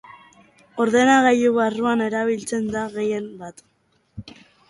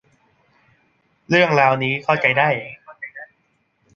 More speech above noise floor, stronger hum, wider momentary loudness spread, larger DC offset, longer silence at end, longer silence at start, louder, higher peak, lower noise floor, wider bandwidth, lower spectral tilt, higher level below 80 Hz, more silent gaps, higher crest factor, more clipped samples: second, 36 dB vs 49 dB; neither; first, 24 LU vs 20 LU; neither; second, 0.4 s vs 0.7 s; second, 0.75 s vs 1.3 s; second, -20 LUFS vs -17 LUFS; second, -4 dBFS vs 0 dBFS; second, -56 dBFS vs -66 dBFS; first, 11.5 kHz vs 7.2 kHz; second, -4.5 dB/octave vs -6 dB/octave; about the same, -58 dBFS vs -62 dBFS; neither; about the same, 18 dB vs 20 dB; neither